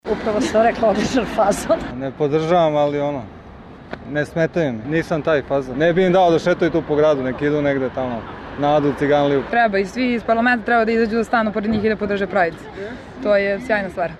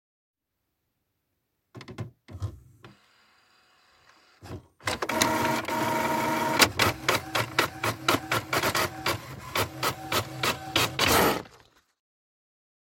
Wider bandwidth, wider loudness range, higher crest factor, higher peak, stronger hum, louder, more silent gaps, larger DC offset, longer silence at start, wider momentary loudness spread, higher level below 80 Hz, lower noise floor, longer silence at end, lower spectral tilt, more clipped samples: second, 13 kHz vs 17 kHz; second, 3 LU vs 20 LU; second, 12 dB vs 28 dB; second, -6 dBFS vs -2 dBFS; neither; first, -18 LUFS vs -26 LUFS; neither; neither; second, 0.05 s vs 1.75 s; second, 10 LU vs 19 LU; first, -44 dBFS vs -54 dBFS; second, -39 dBFS vs -81 dBFS; second, 0 s vs 1.4 s; first, -6 dB/octave vs -3 dB/octave; neither